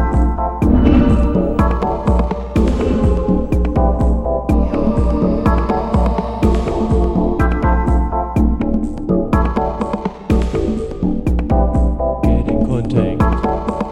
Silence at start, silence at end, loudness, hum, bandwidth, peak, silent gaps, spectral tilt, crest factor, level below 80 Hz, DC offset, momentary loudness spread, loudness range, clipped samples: 0 s; 0 s; -16 LUFS; none; 8.6 kHz; 0 dBFS; none; -9 dB/octave; 14 dB; -18 dBFS; under 0.1%; 4 LU; 3 LU; under 0.1%